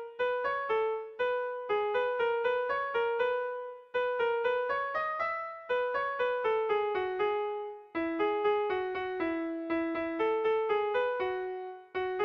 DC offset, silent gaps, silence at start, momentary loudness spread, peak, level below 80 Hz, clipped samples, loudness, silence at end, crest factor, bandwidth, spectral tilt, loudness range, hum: under 0.1%; none; 0 s; 7 LU; -20 dBFS; -68 dBFS; under 0.1%; -32 LUFS; 0 s; 12 dB; 6 kHz; -5.5 dB/octave; 1 LU; none